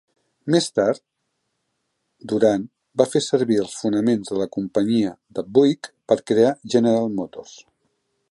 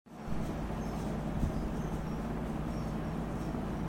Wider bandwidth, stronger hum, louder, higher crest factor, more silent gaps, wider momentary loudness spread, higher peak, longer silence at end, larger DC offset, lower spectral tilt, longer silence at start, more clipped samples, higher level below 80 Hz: second, 11.5 kHz vs 16.5 kHz; neither; first, -21 LUFS vs -37 LUFS; about the same, 20 dB vs 16 dB; neither; first, 11 LU vs 3 LU; first, -2 dBFS vs -20 dBFS; first, 0.7 s vs 0 s; neither; second, -5.5 dB/octave vs -7.5 dB/octave; first, 0.45 s vs 0.05 s; neither; second, -64 dBFS vs -42 dBFS